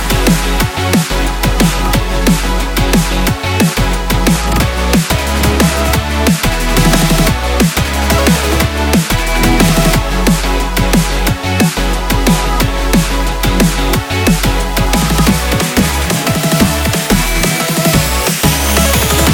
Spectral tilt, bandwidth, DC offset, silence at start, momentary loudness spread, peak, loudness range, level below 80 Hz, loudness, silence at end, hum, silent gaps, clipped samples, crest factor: -4.5 dB/octave; 18.5 kHz; under 0.1%; 0 s; 4 LU; 0 dBFS; 1 LU; -16 dBFS; -12 LUFS; 0 s; none; none; under 0.1%; 12 dB